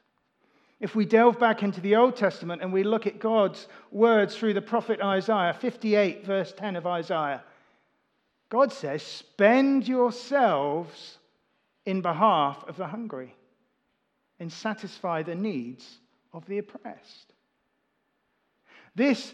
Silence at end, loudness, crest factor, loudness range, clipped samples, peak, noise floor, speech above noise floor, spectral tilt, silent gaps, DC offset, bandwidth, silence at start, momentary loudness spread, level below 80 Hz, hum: 0 s; -26 LUFS; 22 dB; 11 LU; under 0.1%; -6 dBFS; -75 dBFS; 49 dB; -6.5 dB/octave; none; under 0.1%; 9.2 kHz; 0.8 s; 17 LU; -88 dBFS; none